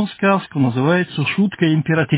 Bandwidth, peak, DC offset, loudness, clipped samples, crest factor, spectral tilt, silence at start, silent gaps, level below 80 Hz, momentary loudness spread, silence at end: 4 kHz; -4 dBFS; under 0.1%; -17 LUFS; under 0.1%; 14 dB; -11 dB/octave; 0 s; none; -56 dBFS; 3 LU; 0 s